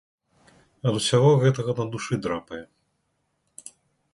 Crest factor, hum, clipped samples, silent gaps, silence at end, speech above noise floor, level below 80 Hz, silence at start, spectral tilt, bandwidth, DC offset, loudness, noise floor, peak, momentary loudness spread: 18 dB; none; under 0.1%; none; 1.5 s; 51 dB; -60 dBFS; 0.85 s; -5.5 dB/octave; 11.5 kHz; under 0.1%; -23 LUFS; -74 dBFS; -8 dBFS; 24 LU